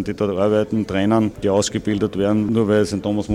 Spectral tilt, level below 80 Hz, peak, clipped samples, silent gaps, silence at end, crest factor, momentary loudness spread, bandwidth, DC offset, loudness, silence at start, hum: -6 dB/octave; -44 dBFS; -6 dBFS; under 0.1%; none; 0 s; 12 dB; 4 LU; 12.5 kHz; under 0.1%; -19 LUFS; 0 s; none